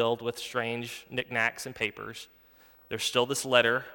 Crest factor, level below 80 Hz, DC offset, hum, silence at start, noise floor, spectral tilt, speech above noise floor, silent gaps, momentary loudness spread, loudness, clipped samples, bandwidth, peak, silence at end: 24 dB; -68 dBFS; under 0.1%; none; 0 s; -58 dBFS; -3 dB/octave; 29 dB; none; 17 LU; -29 LUFS; under 0.1%; 18.5 kHz; -6 dBFS; 0 s